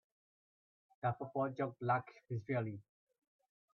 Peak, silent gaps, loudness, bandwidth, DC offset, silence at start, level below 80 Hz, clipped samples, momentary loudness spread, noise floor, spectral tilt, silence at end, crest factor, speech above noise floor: -22 dBFS; none; -40 LUFS; 6.2 kHz; under 0.1%; 1.05 s; -78 dBFS; under 0.1%; 9 LU; under -90 dBFS; -7.5 dB/octave; 0.95 s; 20 dB; over 51 dB